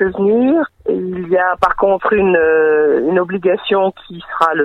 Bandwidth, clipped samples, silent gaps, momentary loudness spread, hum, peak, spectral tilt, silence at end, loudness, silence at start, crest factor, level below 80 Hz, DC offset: 8.2 kHz; under 0.1%; none; 8 LU; none; 0 dBFS; -7.5 dB/octave; 0 s; -14 LUFS; 0 s; 14 dB; -46 dBFS; under 0.1%